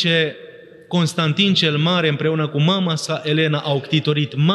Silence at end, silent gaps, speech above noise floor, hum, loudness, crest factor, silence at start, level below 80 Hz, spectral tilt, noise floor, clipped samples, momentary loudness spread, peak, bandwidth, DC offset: 0 s; none; 22 dB; none; -18 LUFS; 14 dB; 0 s; -70 dBFS; -5.5 dB/octave; -40 dBFS; under 0.1%; 6 LU; -4 dBFS; 12 kHz; under 0.1%